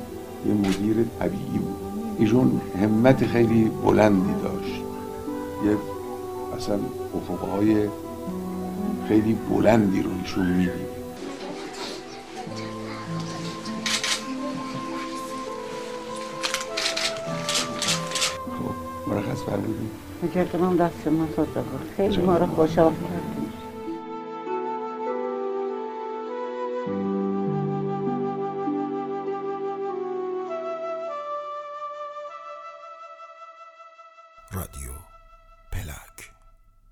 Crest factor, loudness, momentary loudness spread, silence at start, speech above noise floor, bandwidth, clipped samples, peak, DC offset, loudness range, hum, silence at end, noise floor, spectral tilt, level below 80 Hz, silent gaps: 24 dB; -26 LUFS; 15 LU; 0 s; 32 dB; 16 kHz; under 0.1%; -2 dBFS; under 0.1%; 12 LU; none; 0.6 s; -54 dBFS; -5.5 dB/octave; -50 dBFS; none